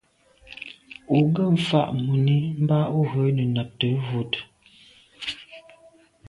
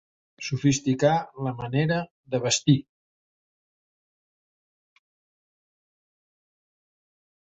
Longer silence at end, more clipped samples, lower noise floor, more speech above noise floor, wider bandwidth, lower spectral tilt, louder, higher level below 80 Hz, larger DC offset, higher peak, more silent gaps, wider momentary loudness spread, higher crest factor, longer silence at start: second, 0.7 s vs 4.8 s; neither; second, -55 dBFS vs under -90 dBFS; second, 34 dB vs over 66 dB; first, 11 kHz vs 8.4 kHz; first, -8 dB/octave vs -5 dB/octave; about the same, -23 LUFS vs -25 LUFS; about the same, -60 dBFS vs -64 dBFS; neither; about the same, -6 dBFS vs -6 dBFS; second, none vs 2.10-2.24 s; first, 18 LU vs 10 LU; about the same, 18 dB vs 22 dB; about the same, 0.5 s vs 0.4 s